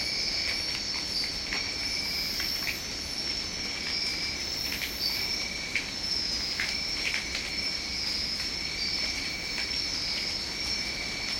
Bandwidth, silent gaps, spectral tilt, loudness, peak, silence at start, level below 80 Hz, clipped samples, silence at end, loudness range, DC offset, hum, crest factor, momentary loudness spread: 16.5 kHz; none; -1 dB/octave; -29 LUFS; -12 dBFS; 0 s; -48 dBFS; under 0.1%; 0 s; 1 LU; under 0.1%; none; 20 dB; 3 LU